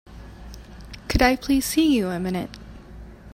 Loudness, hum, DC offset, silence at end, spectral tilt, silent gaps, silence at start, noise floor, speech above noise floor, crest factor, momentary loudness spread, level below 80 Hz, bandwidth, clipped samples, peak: -22 LUFS; none; under 0.1%; 0 s; -4.5 dB/octave; none; 0.1 s; -42 dBFS; 20 dB; 22 dB; 24 LU; -36 dBFS; 16 kHz; under 0.1%; -4 dBFS